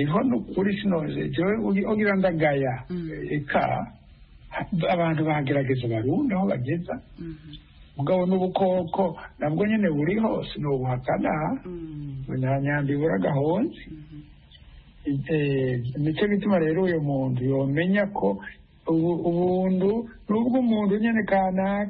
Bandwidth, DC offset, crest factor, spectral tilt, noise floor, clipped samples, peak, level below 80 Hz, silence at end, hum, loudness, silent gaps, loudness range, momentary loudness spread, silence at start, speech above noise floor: 5 kHz; under 0.1%; 14 dB; -12 dB/octave; -49 dBFS; under 0.1%; -10 dBFS; -50 dBFS; 0 s; none; -25 LUFS; none; 3 LU; 12 LU; 0 s; 25 dB